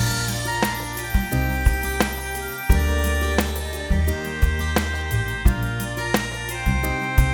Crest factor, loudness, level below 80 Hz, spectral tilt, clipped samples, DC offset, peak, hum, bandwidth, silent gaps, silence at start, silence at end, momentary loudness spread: 20 dB; -23 LUFS; -24 dBFS; -4.5 dB/octave; under 0.1%; under 0.1%; -2 dBFS; none; 19 kHz; none; 0 s; 0 s; 5 LU